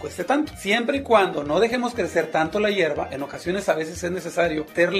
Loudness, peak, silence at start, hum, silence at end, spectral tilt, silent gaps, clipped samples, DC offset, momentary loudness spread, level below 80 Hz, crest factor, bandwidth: -23 LUFS; -4 dBFS; 0 s; none; 0 s; -4.5 dB/octave; none; under 0.1%; under 0.1%; 8 LU; -50 dBFS; 18 dB; 15.5 kHz